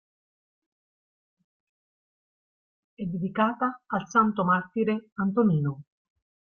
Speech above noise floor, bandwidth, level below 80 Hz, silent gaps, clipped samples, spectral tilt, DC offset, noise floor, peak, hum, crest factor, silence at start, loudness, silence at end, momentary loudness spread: over 64 dB; 6.8 kHz; -68 dBFS; 5.12-5.16 s; under 0.1%; -7.5 dB/octave; under 0.1%; under -90 dBFS; -10 dBFS; none; 20 dB; 3 s; -26 LUFS; 0.7 s; 9 LU